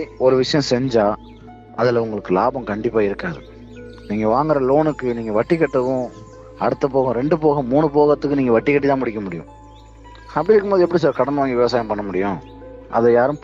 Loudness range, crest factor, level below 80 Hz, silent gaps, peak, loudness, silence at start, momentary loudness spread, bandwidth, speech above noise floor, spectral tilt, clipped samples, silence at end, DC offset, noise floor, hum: 3 LU; 14 dB; -46 dBFS; none; -4 dBFS; -18 LUFS; 0 s; 14 LU; 7.8 kHz; 24 dB; -7 dB/octave; under 0.1%; 0.05 s; under 0.1%; -42 dBFS; none